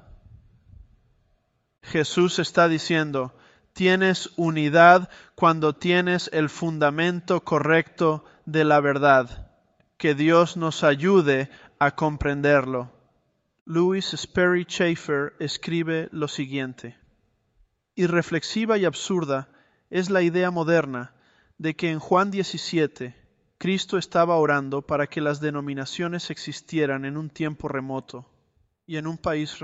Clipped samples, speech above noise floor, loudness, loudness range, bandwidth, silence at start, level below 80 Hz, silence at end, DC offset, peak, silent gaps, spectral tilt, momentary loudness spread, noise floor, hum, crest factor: under 0.1%; 47 dB; -23 LUFS; 8 LU; 8.2 kHz; 1.85 s; -54 dBFS; 0 s; under 0.1%; -2 dBFS; 13.61-13.66 s; -5.5 dB/octave; 13 LU; -70 dBFS; none; 22 dB